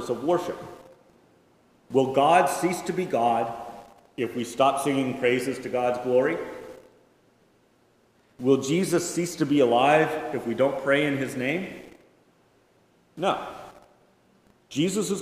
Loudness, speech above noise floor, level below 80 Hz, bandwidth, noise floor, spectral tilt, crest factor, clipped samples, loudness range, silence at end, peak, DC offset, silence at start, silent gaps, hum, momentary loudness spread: -25 LUFS; 39 dB; -66 dBFS; 16 kHz; -63 dBFS; -5 dB/octave; 20 dB; under 0.1%; 7 LU; 0 s; -6 dBFS; under 0.1%; 0 s; none; none; 18 LU